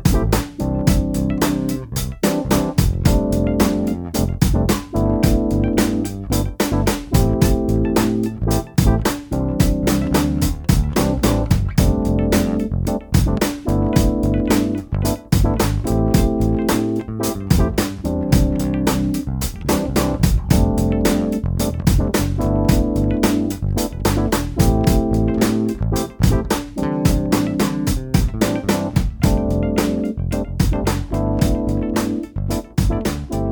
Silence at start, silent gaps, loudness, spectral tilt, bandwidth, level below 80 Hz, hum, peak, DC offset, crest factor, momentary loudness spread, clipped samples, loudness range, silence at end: 0 s; none; -19 LUFS; -6 dB/octave; 19.5 kHz; -24 dBFS; none; 0 dBFS; under 0.1%; 16 dB; 5 LU; under 0.1%; 2 LU; 0 s